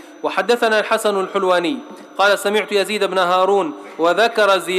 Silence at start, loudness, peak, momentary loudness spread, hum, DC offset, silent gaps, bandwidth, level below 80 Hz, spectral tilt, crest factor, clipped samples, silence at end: 0 s; -17 LUFS; -6 dBFS; 7 LU; none; under 0.1%; none; 15.5 kHz; -70 dBFS; -3 dB/octave; 12 dB; under 0.1%; 0 s